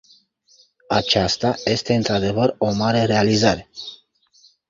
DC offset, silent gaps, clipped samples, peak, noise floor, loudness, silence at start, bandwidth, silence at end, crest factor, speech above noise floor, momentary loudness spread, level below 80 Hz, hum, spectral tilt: under 0.1%; none; under 0.1%; -2 dBFS; -57 dBFS; -19 LUFS; 0.9 s; 7.6 kHz; 0.75 s; 18 dB; 38 dB; 9 LU; -46 dBFS; none; -5 dB/octave